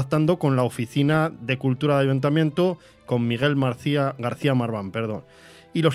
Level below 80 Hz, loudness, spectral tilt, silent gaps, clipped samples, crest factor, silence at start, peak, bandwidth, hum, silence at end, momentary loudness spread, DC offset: -60 dBFS; -23 LUFS; -7.5 dB/octave; none; under 0.1%; 18 dB; 0 s; -6 dBFS; 13 kHz; none; 0 s; 8 LU; under 0.1%